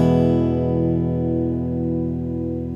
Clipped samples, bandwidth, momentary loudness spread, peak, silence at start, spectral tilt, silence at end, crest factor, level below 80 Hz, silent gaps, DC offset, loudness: under 0.1%; 7 kHz; 7 LU; -6 dBFS; 0 s; -10.5 dB/octave; 0 s; 14 dB; -42 dBFS; none; under 0.1%; -21 LUFS